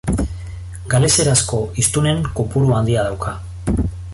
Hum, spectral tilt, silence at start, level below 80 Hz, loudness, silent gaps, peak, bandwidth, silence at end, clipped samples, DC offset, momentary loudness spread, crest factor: none; -4.5 dB/octave; 0.05 s; -30 dBFS; -17 LUFS; none; -2 dBFS; 12 kHz; 0 s; under 0.1%; under 0.1%; 13 LU; 16 dB